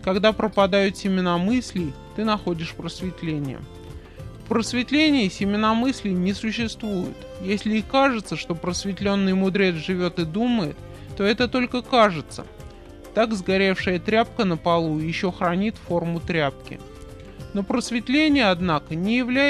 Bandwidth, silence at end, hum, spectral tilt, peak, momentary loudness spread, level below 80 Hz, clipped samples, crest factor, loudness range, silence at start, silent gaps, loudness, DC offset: 12.5 kHz; 0 s; none; -5.5 dB/octave; -6 dBFS; 18 LU; -46 dBFS; under 0.1%; 18 dB; 3 LU; 0 s; none; -23 LUFS; under 0.1%